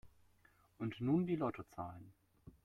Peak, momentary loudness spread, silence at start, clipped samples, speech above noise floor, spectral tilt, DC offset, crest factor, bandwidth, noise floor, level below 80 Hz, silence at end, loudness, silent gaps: -24 dBFS; 14 LU; 0.05 s; under 0.1%; 32 dB; -9 dB/octave; under 0.1%; 18 dB; 12.5 kHz; -71 dBFS; -70 dBFS; 0.15 s; -40 LUFS; none